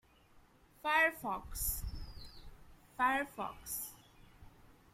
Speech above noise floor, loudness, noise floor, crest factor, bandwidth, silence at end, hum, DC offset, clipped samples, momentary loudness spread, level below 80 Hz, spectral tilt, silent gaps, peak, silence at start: 27 dB; -36 LUFS; -65 dBFS; 22 dB; 16.5 kHz; 0.2 s; none; under 0.1%; under 0.1%; 22 LU; -52 dBFS; -2.5 dB/octave; none; -18 dBFS; 0.35 s